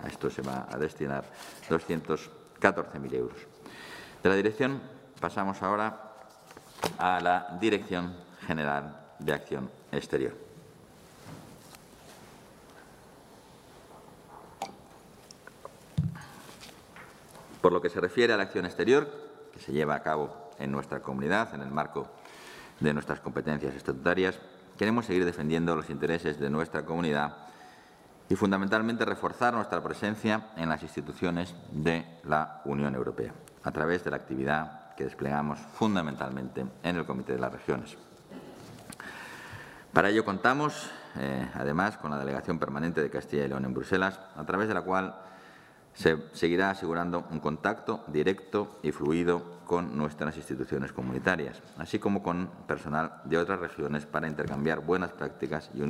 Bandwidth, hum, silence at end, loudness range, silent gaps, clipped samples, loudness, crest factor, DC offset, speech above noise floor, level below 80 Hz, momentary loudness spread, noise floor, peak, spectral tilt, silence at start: 16 kHz; none; 0 s; 8 LU; none; under 0.1%; -31 LUFS; 30 dB; under 0.1%; 25 dB; -60 dBFS; 21 LU; -55 dBFS; -2 dBFS; -6 dB/octave; 0 s